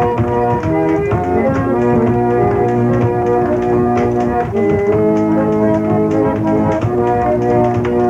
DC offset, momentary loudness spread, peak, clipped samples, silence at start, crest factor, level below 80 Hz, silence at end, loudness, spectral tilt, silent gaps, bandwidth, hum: 0.2%; 2 LU; -2 dBFS; under 0.1%; 0 s; 10 dB; -36 dBFS; 0 s; -14 LUFS; -9 dB/octave; none; 7.8 kHz; none